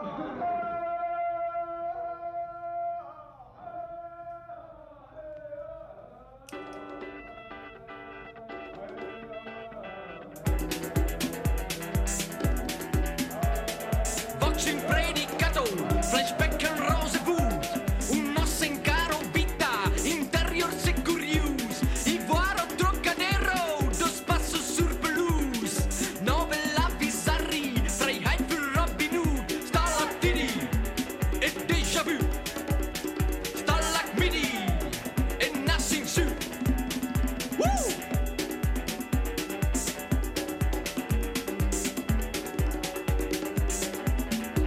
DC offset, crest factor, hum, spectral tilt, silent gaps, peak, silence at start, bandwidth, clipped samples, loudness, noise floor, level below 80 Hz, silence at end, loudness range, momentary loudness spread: under 0.1%; 16 dB; none; -4 dB/octave; none; -12 dBFS; 0 s; 16 kHz; under 0.1%; -28 LUFS; -50 dBFS; -34 dBFS; 0 s; 15 LU; 15 LU